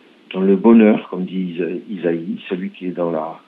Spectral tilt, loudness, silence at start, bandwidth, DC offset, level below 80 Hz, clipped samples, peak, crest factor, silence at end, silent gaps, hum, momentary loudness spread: -10.5 dB/octave; -18 LUFS; 0.3 s; 4 kHz; under 0.1%; -66 dBFS; under 0.1%; 0 dBFS; 18 dB; 0.1 s; none; none; 14 LU